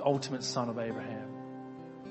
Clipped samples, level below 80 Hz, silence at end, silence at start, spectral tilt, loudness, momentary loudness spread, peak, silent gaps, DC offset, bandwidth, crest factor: under 0.1%; -72 dBFS; 0 s; 0 s; -5 dB/octave; -37 LUFS; 13 LU; -14 dBFS; none; under 0.1%; 8.2 kHz; 20 dB